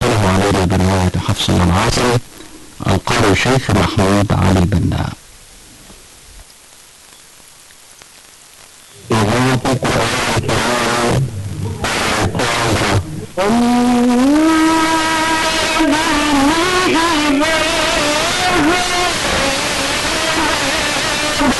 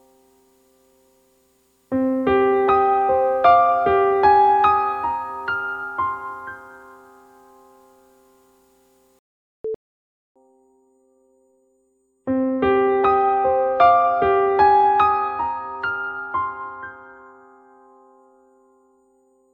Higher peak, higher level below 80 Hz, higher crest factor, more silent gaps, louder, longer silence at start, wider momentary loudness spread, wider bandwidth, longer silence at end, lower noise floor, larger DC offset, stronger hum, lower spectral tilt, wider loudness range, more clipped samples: about the same, -2 dBFS vs -2 dBFS; first, -32 dBFS vs -54 dBFS; about the same, 14 dB vs 18 dB; second, none vs 9.19-9.64 s, 9.75-10.35 s; first, -14 LUFS vs -18 LUFS; second, 0 s vs 1.9 s; second, 5 LU vs 18 LU; first, 12 kHz vs 5.4 kHz; second, 0 s vs 2.4 s; second, -42 dBFS vs -65 dBFS; neither; second, none vs 60 Hz at -65 dBFS; second, -4.5 dB/octave vs -7 dB/octave; second, 7 LU vs 23 LU; neither